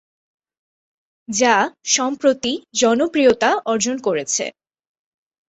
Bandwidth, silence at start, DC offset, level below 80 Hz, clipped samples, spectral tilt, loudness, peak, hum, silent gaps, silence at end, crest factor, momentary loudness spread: 8.4 kHz; 1.3 s; under 0.1%; -60 dBFS; under 0.1%; -2 dB/octave; -18 LUFS; -2 dBFS; none; none; 1 s; 20 dB; 7 LU